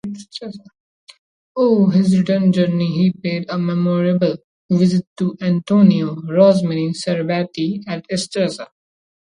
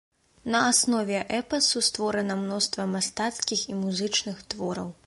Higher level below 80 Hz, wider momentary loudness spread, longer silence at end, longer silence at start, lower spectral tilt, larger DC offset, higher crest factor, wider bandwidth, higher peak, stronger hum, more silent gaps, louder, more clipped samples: about the same, -60 dBFS vs -62 dBFS; first, 16 LU vs 10 LU; first, 0.6 s vs 0.15 s; second, 0.05 s vs 0.45 s; first, -7.5 dB/octave vs -2.5 dB/octave; neither; about the same, 16 dB vs 20 dB; about the same, 10.5 kHz vs 11.5 kHz; first, 0 dBFS vs -8 dBFS; neither; first, 0.80-1.07 s, 1.18-1.55 s, 4.44-4.69 s, 5.07-5.16 s vs none; first, -17 LUFS vs -26 LUFS; neither